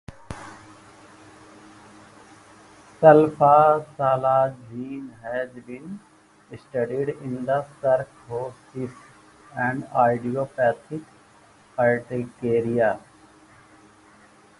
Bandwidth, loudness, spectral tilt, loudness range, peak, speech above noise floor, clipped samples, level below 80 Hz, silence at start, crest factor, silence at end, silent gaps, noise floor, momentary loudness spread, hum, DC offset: 11.5 kHz; -22 LUFS; -8 dB/octave; 8 LU; 0 dBFS; 32 dB; under 0.1%; -60 dBFS; 0.1 s; 24 dB; 1.6 s; none; -54 dBFS; 22 LU; none; under 0.1%